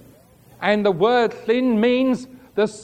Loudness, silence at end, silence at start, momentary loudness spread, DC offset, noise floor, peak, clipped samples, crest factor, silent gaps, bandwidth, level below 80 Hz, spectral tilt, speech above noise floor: -20 LUFS; 0 s; 0.6 s; 8 LU; under 0.1%; -50 dBFS; -4 dBFS; under 0.1%; 16 dB; none; 9.8 kHz; -62 dBFS; -6 dB/octave; 31 dB